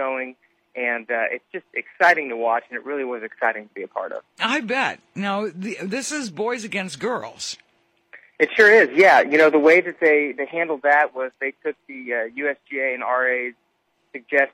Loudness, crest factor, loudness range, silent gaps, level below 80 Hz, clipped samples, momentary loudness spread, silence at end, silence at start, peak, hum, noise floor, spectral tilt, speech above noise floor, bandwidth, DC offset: -20 LUFS; 18 dB; 10 LU; none; -74 dBFS; under 0.1%; 17 LU; 0.05 s; 0 s; -2 dBFS; none; -68 dBFS; -3.5 dB/octave; 48 dB; 13 kHz; under 0.1%